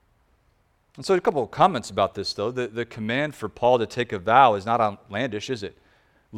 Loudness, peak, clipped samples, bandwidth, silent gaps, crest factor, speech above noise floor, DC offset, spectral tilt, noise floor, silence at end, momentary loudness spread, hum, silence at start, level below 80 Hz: -23 LUFS; -2 dBFS; under 0.1%; 14.5 kHz; none; 22 dB; 42 dB; under 0.1%; -5 dB/octave; -65 dBFS; 0 s; 12 LU; none; 1 s; -58 dBFS